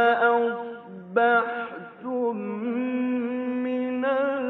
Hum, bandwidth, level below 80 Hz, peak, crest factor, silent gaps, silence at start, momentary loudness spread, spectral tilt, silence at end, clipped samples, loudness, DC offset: none; 4.2 kHz; -76 dBFS; -8 dBFS; 18 dB; none; 0 s; 13 LU; -3.5 dB/octave; 0 s; under 0.1%; -25 LUFS; under 0.1%